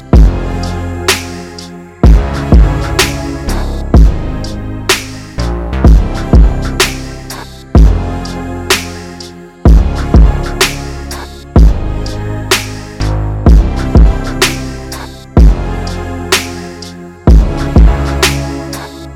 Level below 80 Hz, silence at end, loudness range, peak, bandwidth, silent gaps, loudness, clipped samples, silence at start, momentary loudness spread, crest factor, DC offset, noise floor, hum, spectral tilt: -12 dBFS; 0 s; 2 LU; 0 dBFS; 16 kHz; none; -12 LUFS; under 0.1%; 0 s; 15 LU; 10 dB; under 0.1%; -29 dBFS; none; -5 dB/octave